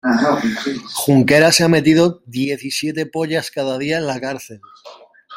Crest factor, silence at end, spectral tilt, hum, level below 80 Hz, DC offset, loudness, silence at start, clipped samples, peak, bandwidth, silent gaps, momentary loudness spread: 16 dB; 0 s; -4.5 dB/octave; none; -56 dBFS; under 0.1%; -16 LUFS; 0.05 s; under 0.1%; 0 dBFS; 16.5 kHz; none; 12 LU